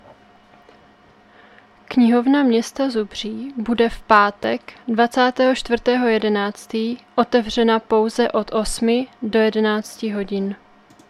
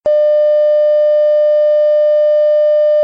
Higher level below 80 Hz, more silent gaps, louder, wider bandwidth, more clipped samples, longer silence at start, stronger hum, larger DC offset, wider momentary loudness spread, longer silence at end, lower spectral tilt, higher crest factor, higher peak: first, -44 dBFS vs -64 dBFS; neither; second, -19 LUFS vs -11 LUFS; first, 13 kHz vs 5 kHz; neither; first, 1.9 s vs 0.05 s; neither; second, under 0.1% vs 0.1%; first, 10 LU vs 0 LU; first, 0.55 s vs 0 s; first, -4.5 dB/octave vs -0.5 dB/octave; first, 20 dB vs 4 dB; first, 0 dBFS vs -6 dBFS